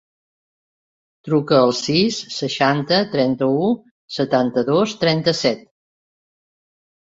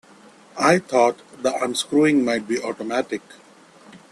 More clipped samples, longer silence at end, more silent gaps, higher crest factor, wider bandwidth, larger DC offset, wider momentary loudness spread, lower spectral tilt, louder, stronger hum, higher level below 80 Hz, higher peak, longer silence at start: neither; first, 1.4 s vs 0.15 s; first, 3.91-4.08 s vs none; about the same, 18 dB vs 20 dB; second, 8 kHz vs 13 kHz; neither; about the same, 9 LU vs 9 LU; about the same, -5 dB/octave vs -4.5 dB/octave; first, -18 LUFS vs -21 LUFS; neither; about the same, -60 dBFS vs -64 dBFS; about the same, -2 dBFS vs -2 dBFS; first, 1.25 s vs 0.55 s